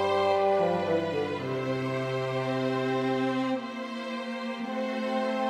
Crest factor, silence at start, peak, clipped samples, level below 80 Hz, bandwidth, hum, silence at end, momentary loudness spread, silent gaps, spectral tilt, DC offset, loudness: 14 dB; 0 s; -14 dBFS; under 0.1%; -70 dBFS; 13 kHz; none; 0 s; 9 LU; none; -6.5 dB/octave; under 0.1%; -29 LUFS